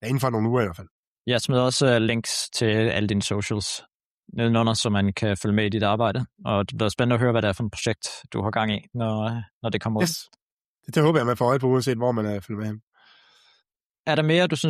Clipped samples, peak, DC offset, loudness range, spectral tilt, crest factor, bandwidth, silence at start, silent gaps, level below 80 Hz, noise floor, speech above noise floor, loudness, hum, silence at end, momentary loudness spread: under 0.1%; -8 dBFS; under 0.1%; 3 LU; -5 dB/octave; 16 dB; 14 kHz; 0 s; 0.91-1.25 s, 3.94-4.23 s, 9.53-9.61 s, 10.42-10.75 s, 12.83-12.92 s, 13.86-14.03 s; -56 dBFS; -74 dBFS; 51 dB; -24 LUFS; none; 0 s; 10 LU